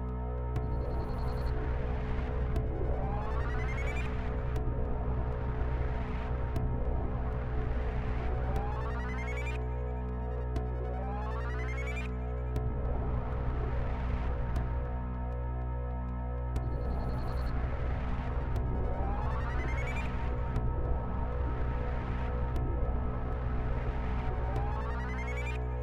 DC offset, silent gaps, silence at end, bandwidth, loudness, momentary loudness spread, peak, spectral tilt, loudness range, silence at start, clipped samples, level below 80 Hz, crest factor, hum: under 0.1%; none; 0 s; 7.2 kHz; -35 LUFS; 2 LU; -18 dBFS; -8.5 dB/octave; 1 LU; 0 s; under 0.1%; -34 dBFS; 14 dB; none